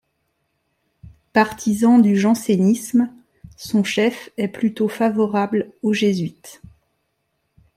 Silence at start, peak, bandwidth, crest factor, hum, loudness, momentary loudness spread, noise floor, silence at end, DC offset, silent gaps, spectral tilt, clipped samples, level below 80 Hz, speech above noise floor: 1.35 s; -2 dBFS; 15 kHz; 18 dB; none; -19 LUFS; 11 LU; -72 dBFS; 1.25 s; under 0.1%; none; -6 dB/octave; under 0.1%; -58 dBFS; 54 dB